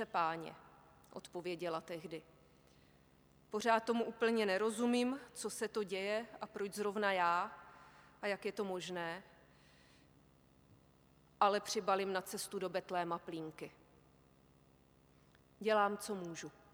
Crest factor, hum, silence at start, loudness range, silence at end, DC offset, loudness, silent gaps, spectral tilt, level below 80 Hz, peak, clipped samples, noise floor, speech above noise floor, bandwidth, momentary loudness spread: 24 dB; 50 Hz at -70 dBFS; 0 s; 9 LU; 0.2 s; under 0.1%; -38 LUFS; none; -4 dB/octave; -76 dBFS; -18 dBFS; under 0.1%; -68 dBFS; 30 dB; 19 kHz; 16 LU